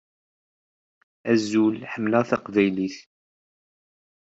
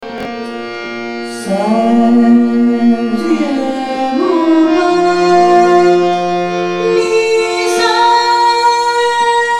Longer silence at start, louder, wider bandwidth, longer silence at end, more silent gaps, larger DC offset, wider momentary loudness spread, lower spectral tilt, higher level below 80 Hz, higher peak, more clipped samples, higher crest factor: first, 1.25 s vs 0 s; second, -23 LUFS vs -11 LUFS; second, 8 kHz vs 12.5 kHz; first, 1.3 s vs 0 s; neither; neither; second, 10 LU vs 13 LU; first, -6 dB/octave vs -4.5 dB/octave; second, -68 dBFS vs -54 dBFS; second, -6 dBFS vs 0 dBFS; neither; first, 22 dB vs 12 dB